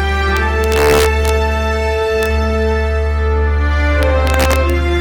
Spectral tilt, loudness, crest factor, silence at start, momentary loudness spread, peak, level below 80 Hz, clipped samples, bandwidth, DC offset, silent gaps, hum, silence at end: -5.5 dB/octave; -14 LUFS; 14 dB; 0 s; 4 LU; 0 dBFS; -16 dBFS; under 0.1%; 17.5 kHz; under 0.1%; none; none; 0 s